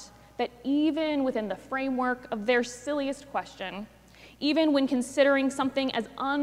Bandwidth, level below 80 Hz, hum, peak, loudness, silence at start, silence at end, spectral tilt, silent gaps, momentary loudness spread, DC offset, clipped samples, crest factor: 13 kHz; -62 dBFS; none; -12 dBFS; -28 LUFS; 0 s; 0 s; -4 dB/octave; none; 12 LU; under 0.1%; under 0.1%; 16 dB